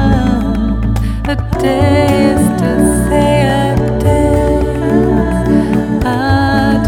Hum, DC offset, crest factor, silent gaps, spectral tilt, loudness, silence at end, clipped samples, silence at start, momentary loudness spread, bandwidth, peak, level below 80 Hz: none; under 0.1%; 10 dB; none; -6.5 dB/octave; -12 LUFS; 0 s; under 0.1%; 0 s; 5 LU; 17 kHz; 0 dBFS; -20 dBFS